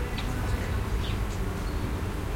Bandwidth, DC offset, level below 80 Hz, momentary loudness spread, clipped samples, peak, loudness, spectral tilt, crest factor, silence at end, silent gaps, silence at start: 16.5 kHz; under 0.1%; -32 dBFS; 2 LU; under 0.1%; -16 dBFS; -31 LUFS; -6 dB/octave; 12 dB; 0 s; none; 0 s